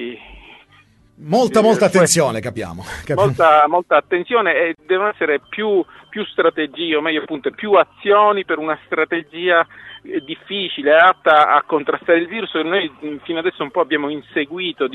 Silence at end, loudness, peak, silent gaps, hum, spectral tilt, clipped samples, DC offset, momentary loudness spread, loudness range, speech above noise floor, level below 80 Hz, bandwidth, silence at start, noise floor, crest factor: 0 s; -17 LUFS; 0 dBFS; none; none; -4 dB/octave; under 0.1%; under 0.1%; 14 LU; 3 LU; 35 dB; -54 dBFS; 12 kHz; 0 s; -51 dBFS; 16 dB